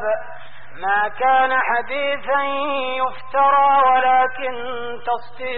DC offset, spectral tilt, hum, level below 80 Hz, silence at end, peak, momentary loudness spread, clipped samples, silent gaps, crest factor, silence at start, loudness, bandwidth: 3%; 0.5 dB/octave; none; -56 dBFS; 0 s; -6 dBFS; 12 LU; under 0.1%; none; 12 dB; 0 s; -19 LUFS; 4.6 kHz